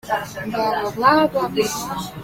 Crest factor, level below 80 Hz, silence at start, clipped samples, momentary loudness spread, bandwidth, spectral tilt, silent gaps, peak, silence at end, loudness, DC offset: 18 dB; -50 dBFS; 0.05 s; under 0.1%; 11 LU; 16.5 kHz; -4 dB/octave; none; -2 dBFS; 0 s; -20 LUFS; under 0.1%